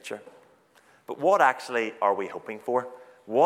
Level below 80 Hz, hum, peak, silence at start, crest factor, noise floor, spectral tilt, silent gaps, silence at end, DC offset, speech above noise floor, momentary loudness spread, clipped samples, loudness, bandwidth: -86 dBFS; none; -6 dBFS; 0.05 s; 20 dB; -60 dBFS; -4.5 dB/octave; none; 0 s; under 0.1%; 34 dB; 19 LU; under 0.1%; -26 LUFS; 15 kHz